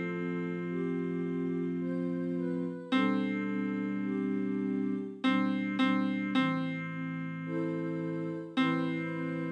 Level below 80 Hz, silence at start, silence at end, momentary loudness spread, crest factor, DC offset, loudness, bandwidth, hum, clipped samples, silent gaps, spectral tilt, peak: -86 dBFS; 0 s; 0 s; 6 LU; 16 dB; under 0.1%; -33 LUFS; 8.8 kHz; none; under 0.1%; none; -8 dB/octave; -16 dBFS